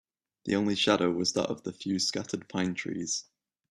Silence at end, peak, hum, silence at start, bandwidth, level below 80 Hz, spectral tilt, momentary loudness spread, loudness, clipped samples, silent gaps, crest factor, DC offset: 0.5 s; -10 dBFS; none; 0.45 s; 13 kHz; -68 dBFS; -3.5 dB/octave; 10 LU; -30 LUFS; under 0.1%; none; 22 dB; under 0.1%